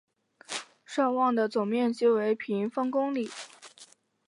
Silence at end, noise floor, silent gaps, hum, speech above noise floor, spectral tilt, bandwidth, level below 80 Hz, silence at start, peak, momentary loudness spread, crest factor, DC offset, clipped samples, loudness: 0.4 s; -56 dBFS; none; none; 29 dB; -5 dB/octave; 11.5 kHz; -84 dBFS; 0.5 s; -14 dBFS; 15 LU; 16 dB; under 0.1%; under 0.1%; -28 LUFS